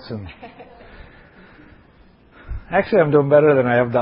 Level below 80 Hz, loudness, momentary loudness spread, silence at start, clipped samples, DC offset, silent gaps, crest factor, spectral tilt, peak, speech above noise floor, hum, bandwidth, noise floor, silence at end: -42 dBFS; -16 LUFS; 23 LU; 0.05 s; under 0.1%; under 0.1%; none; 18 dB; -12 dB/octave; -2 dBFS; 35 dB; none; 5.4 kHz; -50 dBFS; 0 s